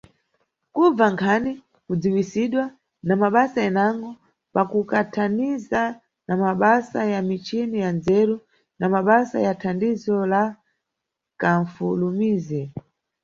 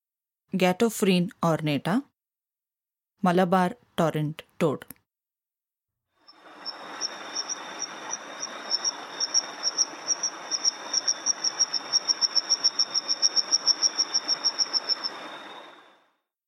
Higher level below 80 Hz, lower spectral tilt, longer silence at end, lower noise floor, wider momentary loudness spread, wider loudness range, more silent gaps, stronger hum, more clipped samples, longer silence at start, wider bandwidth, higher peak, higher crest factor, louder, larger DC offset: first, -60 dBFS vs -74 dBFS; first, -7.5 dB/octave vs -2.5 dB/octave; second, 0.45 s vs 0.75 s; second, -83 dBFS vs under -90 dBFS; about the same, 11 LU vs 13 LU; second, 2 LU vs 12 LU; neither; neither; neither; first, 0.75 s vs 0.55 s; second, 7.4 kHz vs 16.5 kHz; first, -4 dBFS vs -8 dBFS; about the same, 20 dB vs 20 dB; first, -22 LUFS vs -25 LUFS; neither